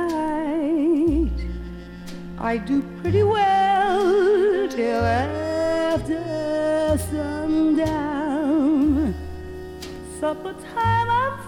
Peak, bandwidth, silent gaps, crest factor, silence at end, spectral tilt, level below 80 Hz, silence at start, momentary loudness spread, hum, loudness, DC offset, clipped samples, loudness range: -8 dBFS; 17.5 kHz; none; 14 dB; 0 s; -6.5 dB/octave; -38 dBFS; 0 s; 16 LU; none; -21 LUFS; under 0.1%; under 0.1%; 3 LU